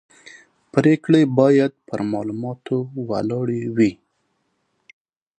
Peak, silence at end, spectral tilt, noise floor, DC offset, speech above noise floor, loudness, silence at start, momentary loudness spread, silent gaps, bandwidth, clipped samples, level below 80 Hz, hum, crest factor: -2 dBFS; 1.45 s; -8 dB/octave; -70 dBFS; under 0.1%; 51 dB; -20 LUFS; 0.25 s; 11 LU; none; 9.2 kHz; under 0.1%; -62 dBFS; none; 20 dB